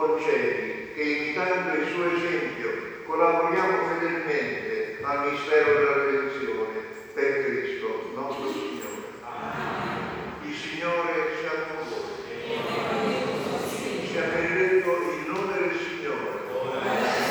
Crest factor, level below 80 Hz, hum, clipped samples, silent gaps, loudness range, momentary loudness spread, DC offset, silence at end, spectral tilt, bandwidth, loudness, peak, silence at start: 18 dB; -62 dBFS; none; under 0.1%; none; 6 LU; 11 LU; under 0.1%; 0 s; -5 dB/octave; over 20 kHz; -27 LUFS; -8 dBFS; 0 s